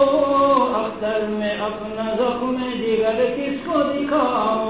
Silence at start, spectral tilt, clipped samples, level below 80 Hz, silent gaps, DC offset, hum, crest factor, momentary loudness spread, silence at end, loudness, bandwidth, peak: 0 s; -9.5 dB/octave; under 0.1%; -50 dBFS; none; 0.2%; none; 14 dB; 8 LU; 0 s; -21 LUFS; 4 kHz; -6 dBFS